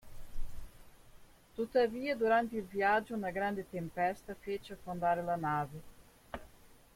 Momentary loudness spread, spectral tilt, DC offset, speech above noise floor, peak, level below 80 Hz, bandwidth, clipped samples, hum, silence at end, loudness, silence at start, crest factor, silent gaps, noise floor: 20 LU; -6 dB/octave; under 0.1%; 25 dB; -18 dBFS; -52 dBFS; 16.5 kHz; under 0.1%; none; 0.2 s; -35 LUFS; 0.05 s; 18 dB; none; -59 dBFS